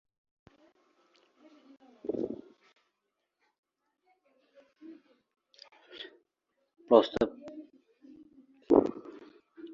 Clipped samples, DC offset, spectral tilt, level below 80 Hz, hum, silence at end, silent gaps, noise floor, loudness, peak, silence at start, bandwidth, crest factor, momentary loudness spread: under 0.1%; under 0.1%; -4.5 dB/octave; -68 dBFS; none; 0 s; 3.58-3.63 s; -84 dBFS; -29 LUFS; -6 dBFS; 2.05 s; 7.4 kHz; 28 dB; 28 LU